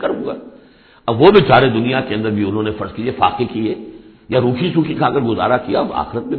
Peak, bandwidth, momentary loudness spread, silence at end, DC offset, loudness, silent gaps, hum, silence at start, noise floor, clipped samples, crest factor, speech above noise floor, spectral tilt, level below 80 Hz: 0 dBFS; 5.4 kHz; 13 LU; 0 s; under 0.1%; -16 LUFS; none; none; 0 s; -46 dBFS; under 0.1%; 16 dB; 31 dB; -10 dB/octave; -44 dBFS